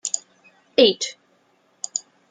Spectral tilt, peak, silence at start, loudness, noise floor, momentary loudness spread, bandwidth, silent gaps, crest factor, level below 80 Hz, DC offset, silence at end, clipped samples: -1.5 dB/octave; -2 dBFS; 0.05 s; -22 LUFS; -62 dBFS; 13 LU; 9.8 kHz; none; 22 dB; -76 dBFS; under 0.1%; 0.3 s; under 0.1%